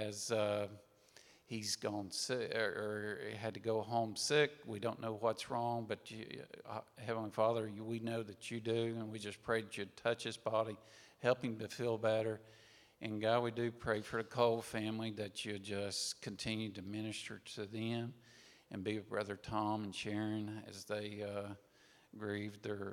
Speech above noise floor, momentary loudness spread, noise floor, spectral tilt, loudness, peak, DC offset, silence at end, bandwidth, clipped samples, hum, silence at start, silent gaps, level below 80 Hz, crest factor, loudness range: 25 dB; 12 LU; -65 dBFS; -4.5 dB/octave; -40 LUFS; -18 dBFS; under 0.1%; 0 s; 17 kHz; under 0.1%; none; 0 s; none; -76 dBFS; 22 dB; 5 LU